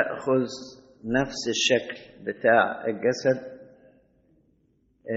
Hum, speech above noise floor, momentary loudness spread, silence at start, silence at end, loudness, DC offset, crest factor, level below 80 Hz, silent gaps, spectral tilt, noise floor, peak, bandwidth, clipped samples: none; 41 dB; 19 LU; 0 s; 0 s; -25 LUFS; under 0.1%; 22 dB; -60 dBFS; none; -2.5 dB/octave; -66 dBFS; -6 dBFS; 8 kHz; under 0.1%